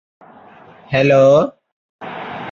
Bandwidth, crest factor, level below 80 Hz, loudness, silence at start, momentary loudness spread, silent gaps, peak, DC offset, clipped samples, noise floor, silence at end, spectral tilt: 7.2 kHz; 16 dB; -54 dBFS; -13 LUFS; 0.9 s; 21 LU; 1.72-1.99 s; -2 dBFS; under 0.1%; under 0.1%; -43 dBFS; 0 s; -7 dB/octave